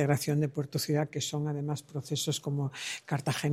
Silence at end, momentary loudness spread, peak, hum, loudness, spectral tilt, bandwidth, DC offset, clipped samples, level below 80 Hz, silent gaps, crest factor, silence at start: 0 s; 6 LU; -12 dBFS; none; -32 LUFS; -5 dB/octave; 16 kHz; under 0.1%; under 0.1%; -70 dBFS; none; 20 dB; 0 s